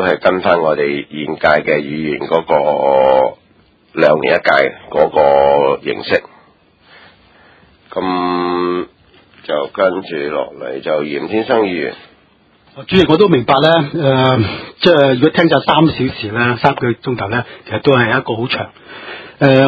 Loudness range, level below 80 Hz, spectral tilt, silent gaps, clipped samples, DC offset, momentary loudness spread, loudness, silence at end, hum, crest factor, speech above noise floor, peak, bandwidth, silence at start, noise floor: 7 LU; -46 dBFS; -8 dB/octave; none; under 0.1%; under 0.1%; 11 LU; -14 LUFS; 0 s; none; 14 dB; 38 dB; 0 dBFS; 7.4 kHz; 0 s; -51 dBFS